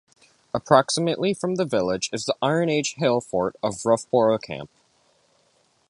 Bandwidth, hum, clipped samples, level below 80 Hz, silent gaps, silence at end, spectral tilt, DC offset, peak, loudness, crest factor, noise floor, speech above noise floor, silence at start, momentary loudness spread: 11.5 kHz; none; under 0.1%; -60 dBFS; none; 1.25 s; -4.5 dB/octave; under 0.1%; -2 dBFS; -23 LUFS; 22 dB; -64 dBFS; 42 dB; 0.55 s; 11 LU